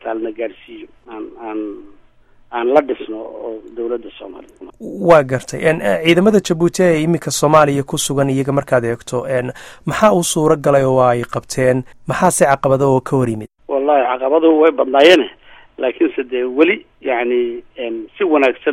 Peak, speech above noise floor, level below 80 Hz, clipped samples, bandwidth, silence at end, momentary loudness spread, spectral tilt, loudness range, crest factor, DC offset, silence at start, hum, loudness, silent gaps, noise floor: 0 dBFS; 32 dB; -48 dBFS; under 0.1%; 15.5 kHz; 0 s; 16 LU; -5 dB/octave; 8 LU; 16 dB; under 0.1%; 0.05 s; none; -15 LUFS; none; -47 dBFS